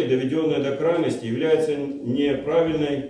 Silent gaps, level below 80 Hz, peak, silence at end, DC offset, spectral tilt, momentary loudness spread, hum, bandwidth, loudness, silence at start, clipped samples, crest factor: none; -56 dBFS; -8 dBFS; 0 s; under 0.1%; -7 dB/octave; 4 LU; none; 10.5 kHz; -23 LUFS; 0 s; under 0.1%; 14 dB